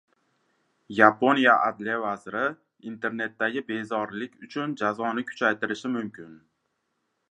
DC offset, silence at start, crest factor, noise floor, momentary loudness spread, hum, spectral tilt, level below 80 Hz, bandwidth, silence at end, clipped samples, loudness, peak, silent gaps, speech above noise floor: under 0.1%; 0.9 s; 26 dB; -77 dBFS; 15 LU; none; -5.5 dB/octave; -74 dBFS; 10 kHz; 0.95 s; under 0.1%; -25 LUFS; -2 dBFS; none; 51 dB